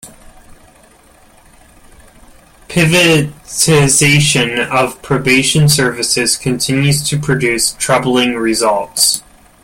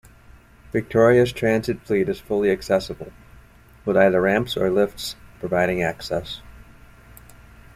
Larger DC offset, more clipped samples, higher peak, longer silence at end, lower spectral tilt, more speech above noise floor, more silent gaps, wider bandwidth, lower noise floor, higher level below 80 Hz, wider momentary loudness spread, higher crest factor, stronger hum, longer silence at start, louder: neither; neither; first, 0 dBFS vs -4 dBFS; second, 0.45 s vs 1.2 s; second, -3.5 dB/octave vs -6 dB/octave; first, 33 dB vs 28 dB; neither; about the same, 17 kHz vs 15.5 kHz; second, -45 dBFS vs -49 dBFS; first, -42 dBFS vs -48 dBFS; second, 6 LU vs 16 LU; second, 14 dB vs 20 dB; neither; second, 0.05 s vs 0.75 s; first, -12 LUFS vs -21 LUFS